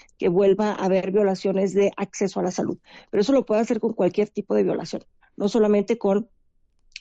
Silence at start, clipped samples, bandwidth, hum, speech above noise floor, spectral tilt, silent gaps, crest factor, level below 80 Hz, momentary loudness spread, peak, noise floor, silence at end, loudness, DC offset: 0.2 s; under 0.1%; 8 kHz; none; 41 dB; -6.5 dB/octave; none; 12 dB; -60 dBFS; 9 LU; -10 dBFS; -63 dBFS; 0.75 s; -22 LUFS; under 0.1%